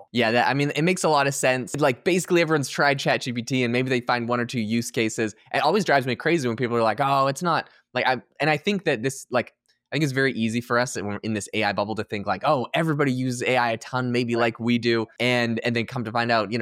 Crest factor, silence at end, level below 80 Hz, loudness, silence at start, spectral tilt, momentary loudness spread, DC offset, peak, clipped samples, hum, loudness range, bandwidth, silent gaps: 16 dB; 0 s; -68 dBFS; -23 LUFS; 0 s; -5 dB/octave; 6 LU; under 0.1%; -8 dBFS; under 0.1%; none; 3 LU; 16 kHz; none